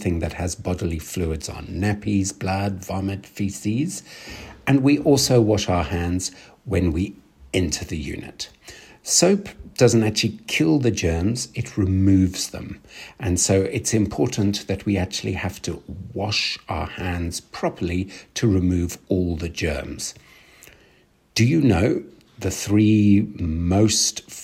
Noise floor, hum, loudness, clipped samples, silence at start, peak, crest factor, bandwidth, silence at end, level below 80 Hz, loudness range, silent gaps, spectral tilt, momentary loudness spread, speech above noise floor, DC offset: -58 dBFS; none; -22 LUFS; under 0.1%; 0 s; -2 dBFS; 20 dB; 16 kHz; 0 s; -40 dBFS; 5 LU; none; -5 dB/octave; 14 LU; 36 dB; under 0.1%